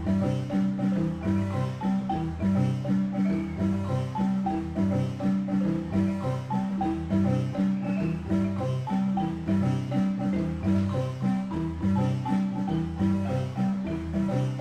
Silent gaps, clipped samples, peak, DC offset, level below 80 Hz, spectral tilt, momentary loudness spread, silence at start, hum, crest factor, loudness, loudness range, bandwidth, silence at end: none; under 0.1%; -14 dBFS; under 0.1%; -48 dBFS; -8.5 dB/octave; 3 LU; 0 s; none; 12 dB; -28 LUFS; 1 LU; 8.8 kHz; 0 s